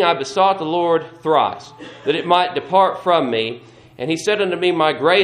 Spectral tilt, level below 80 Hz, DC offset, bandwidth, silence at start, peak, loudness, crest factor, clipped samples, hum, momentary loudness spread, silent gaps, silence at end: -4.5 dB/octave; -64 dBFS; under 0.1%; 12 kHz; 0 s; 0 dBFS; -18 LUFS; 18 dB; under 0.1%; none; 10 LU; none; 0 s